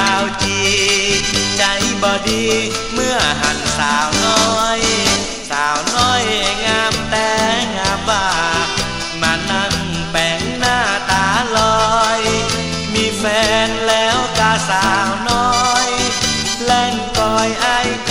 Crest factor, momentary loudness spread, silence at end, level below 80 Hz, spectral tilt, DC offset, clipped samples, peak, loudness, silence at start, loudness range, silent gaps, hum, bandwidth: 16 dB; 4 LU; 0 s; -34 dBFS; -2.5 dB/octave; 1%; under 0.1%; 0 dBFS; -15 LUFS; 0 s; 2 LU; none; none; 16 kHz